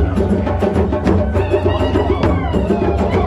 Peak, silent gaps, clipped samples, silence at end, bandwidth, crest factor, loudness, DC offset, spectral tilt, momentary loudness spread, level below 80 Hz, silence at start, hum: -4 dBFS; none; under 0.1%; 0 s; 10.5 kHz; 12 dB; -16 LUFS; under 0.1%; -8.5 dB/octave; 1 LU; -22 dBFS; 0 s; none